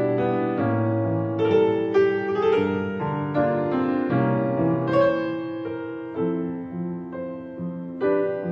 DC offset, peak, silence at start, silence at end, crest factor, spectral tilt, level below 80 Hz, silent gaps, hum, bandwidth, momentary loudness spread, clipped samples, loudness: under 0.1%; -8 dBFS; 0 s; 0 s; 14 dB; -9.5 dB/octave; -60 dBFS; none; none; 6.6 kHz; 11 LU; under 0.1%; -24 LUFS